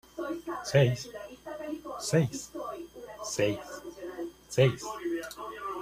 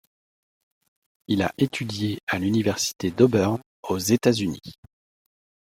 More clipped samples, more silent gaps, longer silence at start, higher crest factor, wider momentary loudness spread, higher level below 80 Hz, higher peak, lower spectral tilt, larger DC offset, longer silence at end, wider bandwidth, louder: neither; second, none vs 2.23-2.27 s, 3.66-3.83 s; second, 0.15 s vs 1.3 s; about the same, 22 dB vs 22 dB; first, 16 LU vs 9 LU; about the same, -62 dBFS vs -60 dBFS; second, -10 dBFS vs -2 dBFS; about the same, -5.5 dB/octave vs -5 dB/octave; neither; second, 0 s vs 1.05 s; about the same, 15 kHz vs 16.5 kHz; second, -31 LUFS vs -24 LUFS